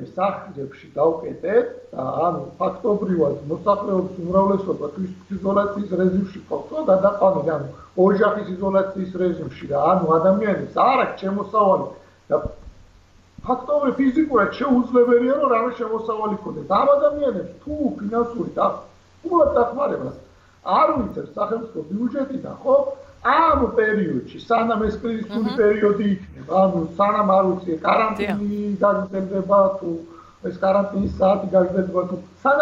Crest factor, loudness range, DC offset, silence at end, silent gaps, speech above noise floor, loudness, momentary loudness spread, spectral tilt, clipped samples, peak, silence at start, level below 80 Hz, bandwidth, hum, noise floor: 14 dB; 3 LU; under 0.1%; 0 s; none; 31 dB; -21 LUFS; 12 LU; -8.5 dB/octave; under 0.1%; -6 dBFS; 0 s; -48 dBFS; 7.4 kHz; none; -51 dBFS